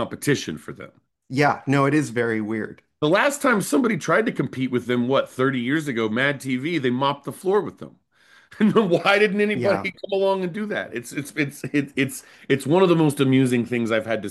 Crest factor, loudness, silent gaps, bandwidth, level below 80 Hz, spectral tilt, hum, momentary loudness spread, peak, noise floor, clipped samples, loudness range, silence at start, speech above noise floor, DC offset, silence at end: 18 dB; -22 LUFS; none; 12.5 kHz; -66 dBFS; -5.5 dB/octave; none; 10 LU; -4 dBFS; -56 dBFS; under 0.1%; 2 LU; 0 s; 34 dB; under 0.1%; 0 s